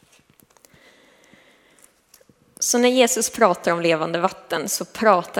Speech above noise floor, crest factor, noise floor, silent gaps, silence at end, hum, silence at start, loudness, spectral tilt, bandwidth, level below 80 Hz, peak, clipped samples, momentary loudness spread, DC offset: 37 dB; 22 dB; -56 dBFS; none; 0 s; none; 2.6 s; -20 LUFS; -2.5 dB/octave; 18 kHz; -66 dBFS; 0 dBFS; under 0.1%; 8 LU; under 0.1%